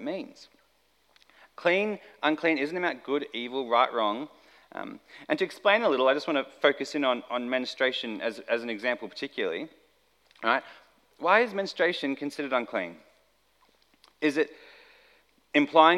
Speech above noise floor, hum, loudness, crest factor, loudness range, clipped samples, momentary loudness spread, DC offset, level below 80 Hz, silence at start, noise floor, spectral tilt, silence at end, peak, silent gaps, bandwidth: 41 dB; none; -28 LUFS; 24 dB; 5 LU; under 0.1%; 13 LU; under 0.1%; -80 dBFS; 0 s; -68 dBFS; -4.5 dB/octave; 0 s; -4 dBFS; none; 13 kHz